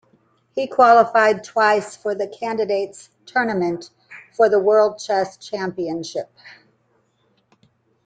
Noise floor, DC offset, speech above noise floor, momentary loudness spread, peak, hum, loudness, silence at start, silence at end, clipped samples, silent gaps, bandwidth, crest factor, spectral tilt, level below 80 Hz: -64 dBFS; under 0.1%; 45 dB; 18 LU; -2 dBFS; none; -19 LUFS; 0.55 s; 1.55 s; under 0.1%; none; 9.2 kHz; 18 dB; -4.5 dB/octave; -68 dBFS